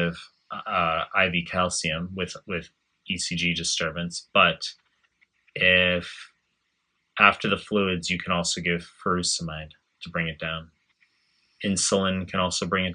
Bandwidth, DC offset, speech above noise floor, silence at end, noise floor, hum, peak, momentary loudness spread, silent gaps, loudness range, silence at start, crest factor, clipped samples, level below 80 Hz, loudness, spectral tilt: 10.5 kHz; under 0.1%; 49 dB; 0 s; -75 dBFS; none; -2 dBFS; 16 LU; none; 5 LU; 0 s; 26 dB; under 0.1%; -58 dBFS; -24 LUFS; -3 dB/octave